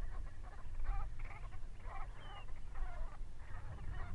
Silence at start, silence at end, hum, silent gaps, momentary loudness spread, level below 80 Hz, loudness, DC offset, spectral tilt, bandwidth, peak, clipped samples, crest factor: 0 s; 0 s; none; none; 7 LU; -44 dBFS; -51 LUFS; under 0.1%; -6 dB/octave; 4.6 kHz; -28 dBFS; under 0.1%; 14 dB